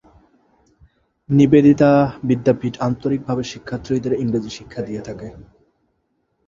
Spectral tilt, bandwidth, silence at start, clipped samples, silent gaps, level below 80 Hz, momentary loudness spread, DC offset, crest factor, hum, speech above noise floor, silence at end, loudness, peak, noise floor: -8 dB/octave; 7.4 kHz; 1.3 s; under 0.1%; none; -48 dBFS; 18 LU; under 0.1%; 18 dB; none; 51 dB; 1.05 s; -18 LUFS; -2 dBFS; -69 dBFS